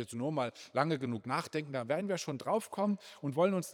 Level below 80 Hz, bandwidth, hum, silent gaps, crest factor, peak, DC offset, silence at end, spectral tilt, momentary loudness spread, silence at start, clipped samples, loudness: -86 dBFS; 19 kHz; none; none; 20 dB; -14 dBFS; under 0.1%; 0 s; -5.5 dB/octave; 6 LU; 0 s; under 0.1%; -35 LUFS